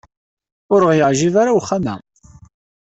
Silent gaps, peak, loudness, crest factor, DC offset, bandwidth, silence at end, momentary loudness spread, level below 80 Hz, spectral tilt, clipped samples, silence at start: none; -2 dBFS; -15 LUFS; 16 dB; under 0.1%; 8.2 kHz; 0.9 s; 10 LU; -52 dBFS; -5.5 dB/octave; under 0.1%; 0.7 s